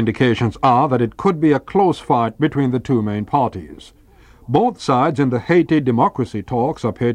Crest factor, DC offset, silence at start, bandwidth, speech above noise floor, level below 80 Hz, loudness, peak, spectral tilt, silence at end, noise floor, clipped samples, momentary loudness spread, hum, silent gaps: 16 dB; under 0.1%; 0 s; 10.5 kHz; 30 dB; -46 dBFS; -17 LUFS; -2 dBFS; -7.5 dB/octave; 0 s; -47 dBFS; under 0.1%; 5 LU; none; none